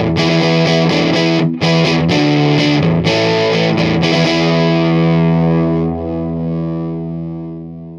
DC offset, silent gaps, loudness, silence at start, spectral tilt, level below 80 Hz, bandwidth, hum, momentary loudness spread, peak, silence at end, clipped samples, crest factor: under 0.1%; none; -13 LUFS; 0 s; -6.5 dB/octave; -40 dBFS; 7.6 kHz; none; 9 LU; 0 dBFS; 0 s; under 0.1%; 14 dB